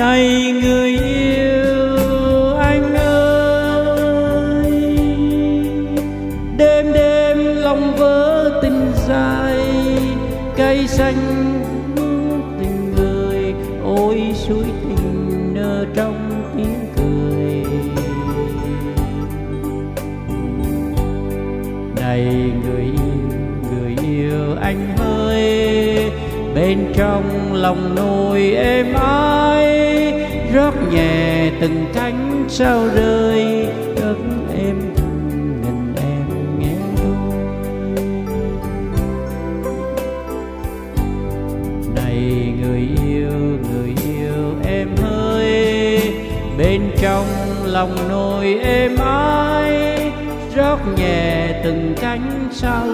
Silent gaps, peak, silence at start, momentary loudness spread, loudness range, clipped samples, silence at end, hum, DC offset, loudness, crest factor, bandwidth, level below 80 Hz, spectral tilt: none; 0 dBFS; 0 s; 9 LU; 7 LU; under 0.1%; 0 s; none; under 0.1%; -17 LUFS; 16 dB; 16 kHz; -26 dBFS; -6.5 dB/octave